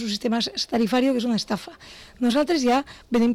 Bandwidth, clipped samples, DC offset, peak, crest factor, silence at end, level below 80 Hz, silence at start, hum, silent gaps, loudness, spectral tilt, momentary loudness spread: 14.5 kHz; under 0.1%; under 0.1%; -14 dBFS; 8 dB; 0 s; -54 dBFS; 0 s; none; none; -23 LUFS; -4.5 dB/octave; 11 LU